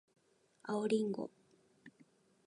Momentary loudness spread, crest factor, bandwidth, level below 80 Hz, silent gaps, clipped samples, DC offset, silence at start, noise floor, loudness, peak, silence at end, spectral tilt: 14 LU; 20 dB; 10.5 kHz; -88 dBFS; none; under 0.1%; under 0.1%; 0.65 s; -69 dBFS; -38 LUFS; -22 dBFS; 0.55 s; -6 dB/octave